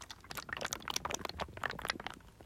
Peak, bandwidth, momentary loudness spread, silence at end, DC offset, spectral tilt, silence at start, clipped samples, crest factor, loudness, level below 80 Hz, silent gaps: -16 dBFS; 16.5 kHz; 8 LU; 0 s; under 0.1%; -2 dB/octave; 0 s; under 0.1%; 26 dB; -40 LUFS; -60 dBFS; none